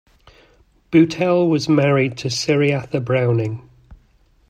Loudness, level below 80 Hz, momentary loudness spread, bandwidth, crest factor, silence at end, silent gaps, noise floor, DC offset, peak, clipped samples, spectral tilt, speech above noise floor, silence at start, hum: -18 LUFS; -54 dBFS; 7 LU; 9.8 kHz; 16 dB; 0.55 s; none; -56 dBFS; under 0.1%; -2 dBFS; under 0.1%; -6 dB/octave; 39 dB; 0.9 s; none